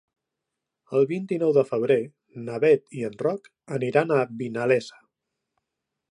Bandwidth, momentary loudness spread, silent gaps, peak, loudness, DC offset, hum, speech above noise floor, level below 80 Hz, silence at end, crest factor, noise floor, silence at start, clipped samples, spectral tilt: 10.5 kHz; 13 LU; none; -6 dBFS; -24 LUFS; under 0.1%; none; 60 dB; -76 dBFS; 1.2 s; 20 dB; -84 dBFS; 0.9 s; under 0.1%; -7 dB/octave